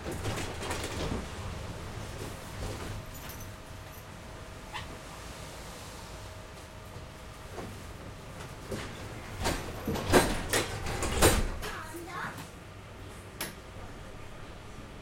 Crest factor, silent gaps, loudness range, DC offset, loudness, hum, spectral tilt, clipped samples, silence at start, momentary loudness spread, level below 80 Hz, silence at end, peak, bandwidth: 28 dB; none; 14 LU; under 0.1%; -35 LUFS; none; -4 dB/octave; under 0.1%; 0 s; 19 LU; -44 dBFS; 0 s; -8 dBFS; 16.5 kHz